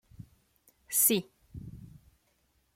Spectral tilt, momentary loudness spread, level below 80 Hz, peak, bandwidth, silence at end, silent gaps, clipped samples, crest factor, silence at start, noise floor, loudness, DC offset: -2.5 dB/octave; 24 LU; -62 dBFS; -12 dBFS; 16.5 kHz; 0.85 s; none; under 0.1%; 24 dB; 0.2 s; -72 dBFS; -26 LUFS; under 0.1%